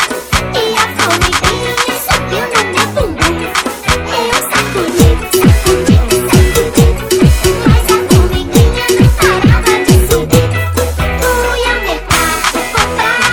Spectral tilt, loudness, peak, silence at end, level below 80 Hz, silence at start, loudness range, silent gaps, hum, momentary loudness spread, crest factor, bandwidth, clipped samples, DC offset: -4.5 dB/octave; -11 LUFS; 0 dBFS; 0 s; -18 dBFS; 0 s; 3 LU; none; none; 5 LU; 10 dB; over 20 kHz; 0.4%; under 0.1%